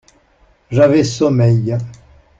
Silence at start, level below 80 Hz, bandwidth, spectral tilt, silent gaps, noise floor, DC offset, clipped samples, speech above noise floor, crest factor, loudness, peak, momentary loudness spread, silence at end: 0.7 s; -48 dBFS; 7.8 kHz; -7 dB/octave; none; -53 dBFS; under 0.1%; under 0.1%; 40 dB; 14 dB; -14 LUFS; -2 dBFS; 11 LU; 0.45 s